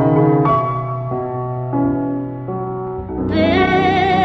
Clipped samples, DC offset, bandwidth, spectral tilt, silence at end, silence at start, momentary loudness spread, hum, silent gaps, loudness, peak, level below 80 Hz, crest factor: under 0.1%; under 0.1%; 7.6 kHz; -8.5 dB/octave; 0 s; 0 s; 11 LU; none; none; -18 LUFS; -2 dBFS; -38 dBFS; 14 dB